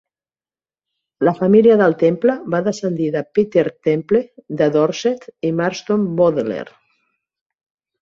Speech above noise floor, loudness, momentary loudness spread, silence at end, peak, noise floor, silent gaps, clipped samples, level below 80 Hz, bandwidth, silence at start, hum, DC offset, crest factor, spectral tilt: over 74 dB; -17 LUFS; 10 LU; 1.4 s; -2 dBFS; under -90 dBFS; none; under 0.1%; -60 dBFS; 7.6 kHz; 1.2 s; none; under 0.1%; 16 dB; -7 dB/octave